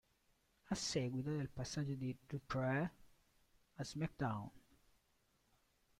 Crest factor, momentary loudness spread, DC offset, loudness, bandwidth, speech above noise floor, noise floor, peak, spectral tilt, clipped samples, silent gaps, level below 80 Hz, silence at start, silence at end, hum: 18 dB; 9 LU; under 0.1%; -43 LUFS; 14.5 kHz; 36 dB; -79 dBFS; -26 dBFS; -5.5 dB/octave; under 0.1%; none; -68 dBFS; 0.65 s; 1.4 s; none